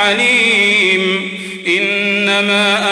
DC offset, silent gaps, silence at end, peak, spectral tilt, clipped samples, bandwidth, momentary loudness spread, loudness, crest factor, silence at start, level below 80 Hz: under 0.1%; none; 0 s; -2 dBFS; -3 dB/octave; under 0.1%; 11 kHz; 8 LU; -12 LUFS; 12 dB; 0 s; -58 dBFS